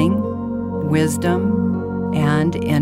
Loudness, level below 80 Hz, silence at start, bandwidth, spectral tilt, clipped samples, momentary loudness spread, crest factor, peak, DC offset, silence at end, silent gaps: -19 LUFS; -46 dBFS; 0 s; 16 kHz; -7 dB/octave; under 0.1%; 6 LU; 14 dB; -4 dBFS; under 0.1%; 0 s; none